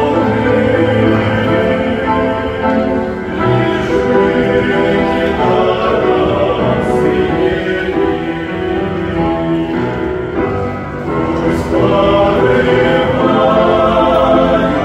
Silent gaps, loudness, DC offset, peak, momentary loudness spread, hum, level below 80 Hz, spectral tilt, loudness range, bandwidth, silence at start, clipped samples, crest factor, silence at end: none; -13 LUFS; under 0.1%; 0 dBFS; 7 LU; none; -32 dBFS; -7.5 dB/octave; 5 LU; 11.5 kHz; 0 s; under 0.1%; 12 dB; 0 s